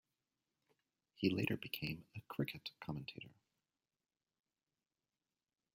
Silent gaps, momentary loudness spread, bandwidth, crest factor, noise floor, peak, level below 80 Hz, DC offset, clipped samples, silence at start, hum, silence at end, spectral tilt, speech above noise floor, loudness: none; 14 LU; 16 kHz; 26 dB; under -90 dBFS; -22 dBFS; -76 dBFS; under 0.1%; under 0.1%; 1.2 s; none; 2.45 s; -6.5 dB/octave; over 47 dB; -43 LUFS